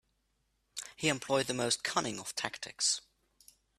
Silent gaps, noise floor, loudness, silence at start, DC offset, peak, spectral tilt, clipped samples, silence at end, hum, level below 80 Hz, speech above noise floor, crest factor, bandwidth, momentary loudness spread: none; -78 dBFS; -33 LUFS; 0.75 s; under 0.1%; -12 dBFS; -2 dB/octave; under 0.1%; 0.8 s; none; -72 dBFS; 44 dB; 24 dB; 15 kHz; 11 LU